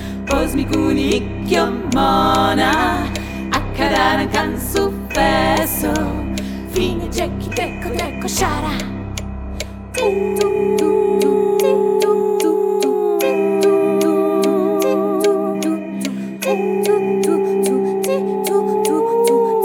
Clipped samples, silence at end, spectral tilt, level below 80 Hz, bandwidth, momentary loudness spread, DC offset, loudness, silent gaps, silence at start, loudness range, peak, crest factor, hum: under 0.1%; 0 s; -5 dB/octave; -34 dBFS; 17.5 kHz; 8 LU; under 0.1%; -17 LUFS; none; 0 s; 5 LU; 0 dBFS; 16 dB; none